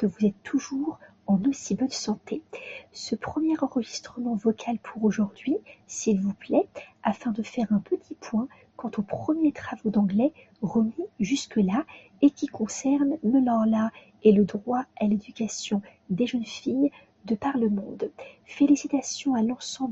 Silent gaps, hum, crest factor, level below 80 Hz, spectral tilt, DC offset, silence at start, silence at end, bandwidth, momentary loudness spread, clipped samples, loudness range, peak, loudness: none; none; 20 dB; -64 dBFS; -6 dB/octave; under 0.1%; 0 s; 0 s; 8.2 kHz; 11 LU; under 0.1%; 5 LU; -6 dBFS; -27 LUFS